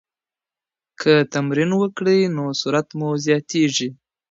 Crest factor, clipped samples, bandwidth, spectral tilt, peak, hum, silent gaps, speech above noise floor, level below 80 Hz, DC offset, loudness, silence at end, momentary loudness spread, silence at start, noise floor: 20 dB; under 0.1%; 7.8 kHz; -5 dB/octave; -2 dBFS; none; none; over 71 dB; -68 dBFS; under 0.1%; -19 LUFS; 0.35 s; 6 LU; 1 s; under -90 dBFS